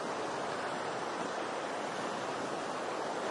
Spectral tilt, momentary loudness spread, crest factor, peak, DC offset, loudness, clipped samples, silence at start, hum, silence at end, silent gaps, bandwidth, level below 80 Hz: -3.5 dB/octave; 1 LU; 14 dB; -24 dBFS; under 0.1%; -37 LUFS; under 0.1%; 0 s; none; 0 s; none; 11.5 kHz; -82 dBFS